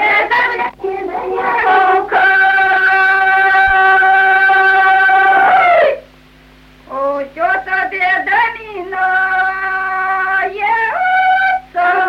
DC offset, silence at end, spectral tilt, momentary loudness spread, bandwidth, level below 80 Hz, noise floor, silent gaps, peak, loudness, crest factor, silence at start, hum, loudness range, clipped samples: under 0.1%; 0 s; -4 dB/octave; 10 LU; 12.5 kHz; -46 dBFS; -43 dBFS; none; -2 dBFS; -11 LUFS; 12 dB; 0 s; none; 6 LU; under 0.1%